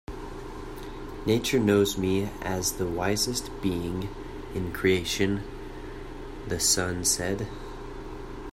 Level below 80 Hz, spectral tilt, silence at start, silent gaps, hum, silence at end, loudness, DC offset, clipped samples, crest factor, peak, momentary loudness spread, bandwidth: -42 dBFS; -3.5 dB/octave; 0.1 s; none; none; 0 s; -27 LUFS; under 0.1%; under 0.1%; 18 dB; -10 dBFS; 17 LU; 16 kHz